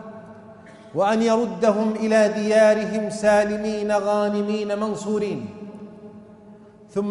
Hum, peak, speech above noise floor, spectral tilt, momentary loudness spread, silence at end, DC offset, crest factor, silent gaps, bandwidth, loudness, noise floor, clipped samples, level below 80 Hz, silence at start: none; -6 dBFS; 26 dB; -5.5 dB/octave; 19 LU; 0 s; under 0.1%; 16 dB; none; 11.5 kHz; -21 LUFS; -46 dBFS; under 0.1%; -60 dBFS; 0 s